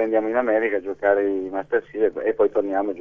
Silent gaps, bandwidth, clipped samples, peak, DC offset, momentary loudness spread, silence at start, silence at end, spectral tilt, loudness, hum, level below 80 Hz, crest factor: none; 3.7 kHz; under 0.1%; -6 dBFS; 0.2%; 4 LU; 0 s; 0 s; -7.5 dB/octave; -22 LUFS; none; -60 dBFS; 16 dB